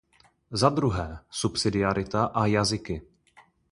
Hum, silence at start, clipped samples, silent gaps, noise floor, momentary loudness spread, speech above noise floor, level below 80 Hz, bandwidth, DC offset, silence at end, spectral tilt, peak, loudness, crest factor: none; 0.5 s; under 0.1%; none; -59 dBFS; 11 LU; 33 dB; -46 dBFS; 11.5 kHz; under 0.1%; 0.7 s; -5 dB/octave; -4 dBFS; -26 LUFS; 22 dB